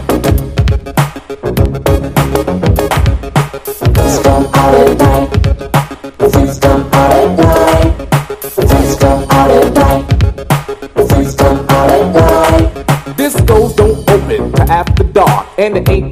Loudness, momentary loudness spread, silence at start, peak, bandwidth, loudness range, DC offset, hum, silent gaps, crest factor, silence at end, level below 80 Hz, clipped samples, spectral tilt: -10 LUFS; 7 LU; 0 s; 0 dBFS; 16 kHz; 3 LU; under 0.1%; none; none; 10 dB; 0 s; -18 dBFS; 1%; -6.5 dB/octave